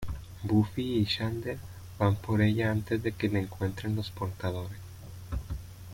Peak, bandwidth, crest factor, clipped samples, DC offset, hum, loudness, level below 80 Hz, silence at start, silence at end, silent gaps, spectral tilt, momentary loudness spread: -14 dBFS; 16.5 kHz; 18 dB; under 0.1%; under 0.1%; none; -31 LUFS; -48 dBFS; 0 s; 0 s; none; -7 dB/octave; 15 LU